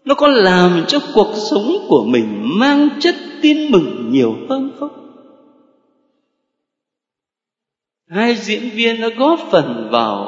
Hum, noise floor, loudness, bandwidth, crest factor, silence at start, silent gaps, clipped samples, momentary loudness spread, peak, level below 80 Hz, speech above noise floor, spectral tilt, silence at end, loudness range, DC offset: none; -86 dBFS; -14 LUFS; 7.8 kHz; 16 dB; 0.05 s; none; under 0.1%; 9 LU; 0 dBFS; -56 dBFS; 72 dB; -5.5 dB/octave; 0 s; 13 LU; under 0.1%